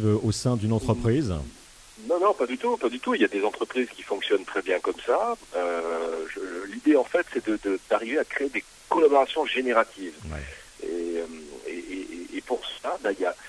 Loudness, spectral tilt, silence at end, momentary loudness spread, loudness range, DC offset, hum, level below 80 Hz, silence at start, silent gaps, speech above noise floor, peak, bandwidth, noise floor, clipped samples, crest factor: -26 LUFS; -6 dB/octave; 0 s; 14 LU; 5 LU; under 0.1%; none; -50 dBFS; 0 s; none; 21 dB; -6 dBFS; 11 kHz; -46 dBFS; under 0.1%; 20 dB